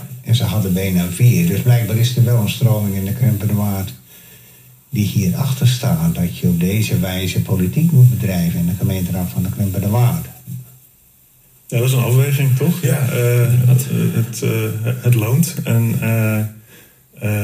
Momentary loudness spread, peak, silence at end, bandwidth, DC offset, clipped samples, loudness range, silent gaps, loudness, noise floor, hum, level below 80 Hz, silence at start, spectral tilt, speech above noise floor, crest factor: 7 LU; -2 dBFS; 0 s; 15.5 kHz; under 0.1%; under 0.1%; 4 LU; none; -16 LUFS; -50 dBFS; none; -52 dBFS; 0 s; -6.5 dB/octave; 35 dB; 16 dB